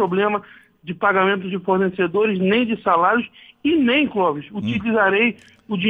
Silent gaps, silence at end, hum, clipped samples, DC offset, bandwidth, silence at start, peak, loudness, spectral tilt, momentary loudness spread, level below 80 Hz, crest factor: none; 0 s; none; under 0.1%; under 0.1%; 4.7 kHz; 0 s; -4 dBFS; -19 LUFS; -8 dB/octave; 10 LU; -58 dBFS; 16 dB